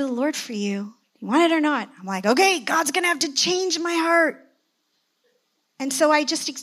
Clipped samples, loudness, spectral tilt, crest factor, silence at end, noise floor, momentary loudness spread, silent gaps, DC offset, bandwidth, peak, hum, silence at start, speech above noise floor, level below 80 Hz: under 0.1%; -21 LUFS; -2.5 dB/octave; 18 dB; 0 s; -71 dBFS; 10 LU; none; under 0.1%; 15.5 kHz; -4 dBFS; none; 0 s; 50 dB; -88 dBFS